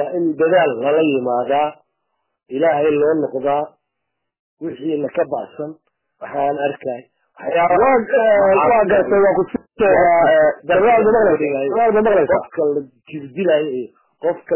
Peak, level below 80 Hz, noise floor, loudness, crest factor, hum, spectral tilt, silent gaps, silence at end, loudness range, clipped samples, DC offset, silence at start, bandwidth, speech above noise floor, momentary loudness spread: -4 dBFS; -52 dBFS; -77 dBFS; -16 LUFS; 12 dB; none; -9.5 dB/octave; 4.39-4.57 s; 0 s; 10 LU; under 0.1%; under 0.1%; 0 s; 3.2 kHz; 61 dB; 16 LU